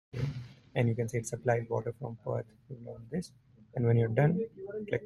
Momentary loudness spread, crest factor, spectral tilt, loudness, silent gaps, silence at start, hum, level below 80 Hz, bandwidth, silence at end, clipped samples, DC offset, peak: 18 LU; 20 dB; -7.5 dB/octave; -33 LUFS; none; 0.15 s; none; -62 dBFS; 12 kHz; 0 s; under 0.1%; under 0.1%; -12 dBFS